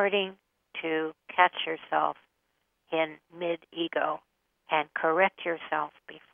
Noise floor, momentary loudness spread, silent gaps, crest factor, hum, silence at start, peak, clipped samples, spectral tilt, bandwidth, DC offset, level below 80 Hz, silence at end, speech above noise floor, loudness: -77 dBFS; 12 LU; none; 24 dB; none; 0 s; -6 dBFS; under 0.1%; -7 dB/octave; 3.7 kHz; under 0.1%; -82 dBFS; 0.15 s; 47 dB; -29 LUFS